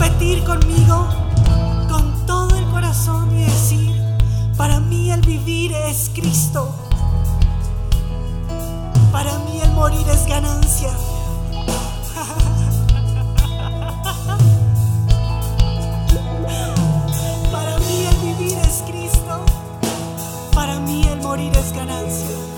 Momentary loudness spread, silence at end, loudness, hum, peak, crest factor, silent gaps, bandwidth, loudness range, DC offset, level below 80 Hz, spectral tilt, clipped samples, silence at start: 8 LU; 0 s; -18 LUFS; none; 0 dBFS; 16 dB; none; 19 kHz; 3 LU; 0.2%; -20 dBFS; -5.5 dB/octave; under 0.1%; 0 s